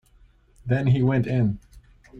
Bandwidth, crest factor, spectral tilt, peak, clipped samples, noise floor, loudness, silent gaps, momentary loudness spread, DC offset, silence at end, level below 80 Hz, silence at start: 4.7 kHz; 14 dB; -9.5 dB/octave; -10 dBFS; under 0.1%; -56 dBFS; -23 LUFS; none; 15 LU; under 0.1%; 0 s; -50 dBFS; 0.65 s